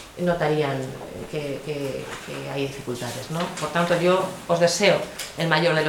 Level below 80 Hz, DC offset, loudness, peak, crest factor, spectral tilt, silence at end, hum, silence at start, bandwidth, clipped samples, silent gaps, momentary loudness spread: -54 dBFS; under 0.1%; -24 LUFS; -2 dBFS; 22 dB; -4.5 dB/octave; 0 s; none; 0 s; 19 kHz; under 0.1%; none; 13 LU